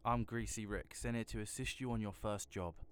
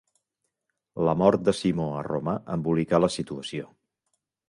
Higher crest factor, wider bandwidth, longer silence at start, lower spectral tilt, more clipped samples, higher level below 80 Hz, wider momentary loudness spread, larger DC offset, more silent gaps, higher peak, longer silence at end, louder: about the same, 18 dB vs 22 dB; first, 20 kHz vs 11.5 kHz; second, 0 s vs 0.95 s; second, -5 dB/octave vs -6.5 dB/octave; neither; about the same, -54 dBFS vs -56 dBFS; second, 5 LU vs 14 LU; neither; neither; second, -22 dBFS vs -6 dBFS; second, 0 s vs 0.85 s; second, -43 LUFS vs -26 LUFS